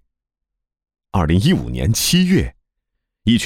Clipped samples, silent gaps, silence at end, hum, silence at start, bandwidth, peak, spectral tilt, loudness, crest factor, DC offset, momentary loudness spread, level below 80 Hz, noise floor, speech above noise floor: under 0.1%; none; 0 s; none; 1.15 s; 17 kHz; -4 dBFS; -5 dB/octave; -17 LUFS; 14 dB; under 0.1%; 9 LU; -32 dBFS; -81 dBFS; 65 dB